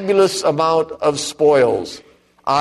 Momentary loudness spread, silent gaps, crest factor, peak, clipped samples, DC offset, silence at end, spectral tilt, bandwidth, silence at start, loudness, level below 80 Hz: 14 LU; none; 14 dB; -4 dBFS; under 0.1%; under 0.1%; 0 s; -4 dB/octave; 13 kHz; 0 s; -16 LUFS; -56 dBFS